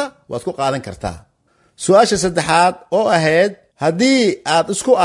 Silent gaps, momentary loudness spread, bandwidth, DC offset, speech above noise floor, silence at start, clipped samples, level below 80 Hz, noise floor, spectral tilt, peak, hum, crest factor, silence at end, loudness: none; 13 LU; 11.5 kHz; under 0.1%; 44 dB; 0 s; under 0.1%; -48 dBFS; -59 dBFS; -4 dB/octave; 0 dBFS; none; 16 dB; 0 s; -16 LUFS